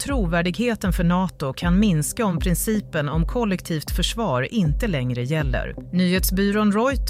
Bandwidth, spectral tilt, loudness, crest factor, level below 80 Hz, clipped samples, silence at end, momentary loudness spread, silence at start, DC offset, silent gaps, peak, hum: 16 kHz; -5.5 dB/octave; -22 LUFS; 14 dB; -30 dBFS; under 0.1%; 0 s; 6 LU; 0 s; under 0.1%; none; -8 dBFS; none